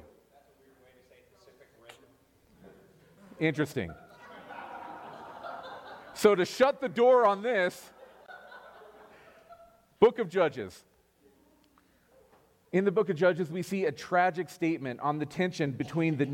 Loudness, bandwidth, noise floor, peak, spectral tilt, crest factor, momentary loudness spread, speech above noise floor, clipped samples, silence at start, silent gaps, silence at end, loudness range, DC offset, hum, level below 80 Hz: -28 LUFS; 16.5 kHz; -65 dBFS; -8 dBFS; -6 dB/octave; 24 dB; 22 LU; 38 dB; under 0.1%; 2.65 s; none; 0 s; 10 LU; under 0.1%; none; -70 dBFS